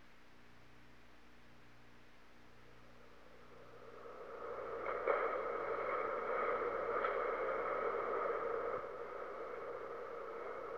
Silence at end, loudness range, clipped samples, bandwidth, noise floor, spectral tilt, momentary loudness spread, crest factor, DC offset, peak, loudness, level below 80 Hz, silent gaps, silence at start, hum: 0 s; 16 LU; under 0.1%; 7.8 kHz; -64 dBFS; -5.5 dB/octave; 23 LU; 22 dB; 0.1%; -20 dBFS; -41 LUFS; -72 dBFS; none; 0 s; 60 Hz at -70 dBFS